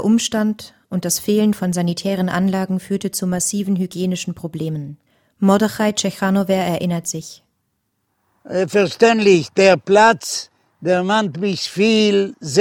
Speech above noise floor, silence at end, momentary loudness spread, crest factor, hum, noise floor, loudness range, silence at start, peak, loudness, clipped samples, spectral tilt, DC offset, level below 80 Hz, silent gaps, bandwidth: 53 dB; 0 s; 13 LU; 18 dB; none; -70 dBFS; 6 LU; 0 s; 0 dBFS; -18 LUFS; under 0.1%; -4.5 dB/octave; under 0.1%; -58 dBFS; none; 18 kHz